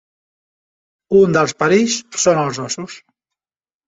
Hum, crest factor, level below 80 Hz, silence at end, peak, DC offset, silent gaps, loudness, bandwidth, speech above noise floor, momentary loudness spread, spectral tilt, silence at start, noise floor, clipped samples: none; 16 dB; -56 dBFS; 0.9 s; -2 dBFS; under 0.1%; none; -16 LUFS; 8 kHz; over 75 dB; 12 LU; -4 dB/octave; 1.1 s; under -90 dBFS; under 0.1%